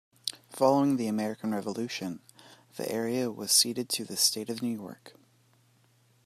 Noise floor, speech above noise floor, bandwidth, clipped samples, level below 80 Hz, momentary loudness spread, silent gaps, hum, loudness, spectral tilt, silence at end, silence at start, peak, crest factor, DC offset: -65 dBFS; 36 dB; 15 kHz; under 0.1%; -80 dBFS; 15 LU; none; none; -29 LUFS; -3 dB/octave; 1.15 s; 0.25 s; -8 dBFS; 24 dB; under 0.1%